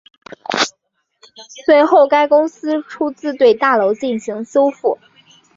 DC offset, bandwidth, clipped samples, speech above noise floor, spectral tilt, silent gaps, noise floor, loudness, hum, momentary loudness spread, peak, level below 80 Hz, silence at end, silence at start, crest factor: under 0.1%; 7.8 kHz; under 0.1%; 53 dB; -3.5 dB/octave; none; -67 dBFS; -15 LUFS; none; 12 LU; -2 dBFS; -66 dBFS; 0.6 s; 0.5 s; 14 dB